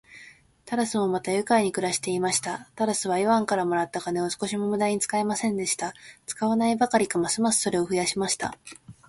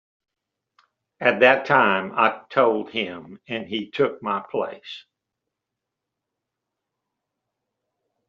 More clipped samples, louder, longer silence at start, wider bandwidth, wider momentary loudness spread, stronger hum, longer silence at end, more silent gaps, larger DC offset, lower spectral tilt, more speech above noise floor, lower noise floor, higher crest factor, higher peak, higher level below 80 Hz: neither; second, -25 LUFS vs -21 LUFS; second, 0.1 s vs 1.2 s; first, 11.5 kHz vs 7 kHz; second, 7 LU vs 15 LU; neither; second, 0.15 s vs 3.3 s; neither; neither; first, -3.5 dB/octave vs -2 dB/octave; second, 26 dB vs 62 dB; second, -51 dBFS vs -84 dBFS; about the same, 18 dB vs 22 dB; second, -8 dBFS vs -2 dBFS; first, -64 dBFS vs -72 dBFS